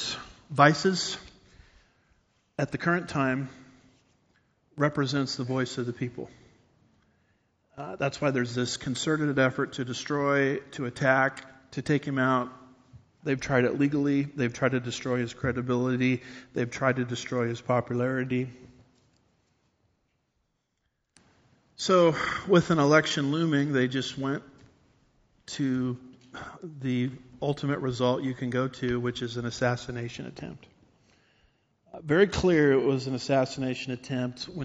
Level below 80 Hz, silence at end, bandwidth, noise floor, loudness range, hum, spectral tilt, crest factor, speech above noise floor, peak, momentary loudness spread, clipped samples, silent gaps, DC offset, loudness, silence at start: -58 dBFS; 0 s; 8 kHz; -78 dBFS; 8 LU; none; -5 dB/octave; 26 dB; 51 dB; -4 dBFS; 15 LU; under 0.1%; none; under 0.1%; -27 LUFS; 0 s